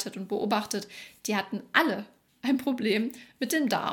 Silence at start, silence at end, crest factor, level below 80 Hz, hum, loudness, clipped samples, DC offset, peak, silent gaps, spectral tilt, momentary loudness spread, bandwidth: 0 s; 0 s; 24 dB; -74 dBFS; none; -29 LUFS; under 0.1%; under 0.1%; -4 dBFS; none; -3.5 dB/octave; 11 LU; 19 kHz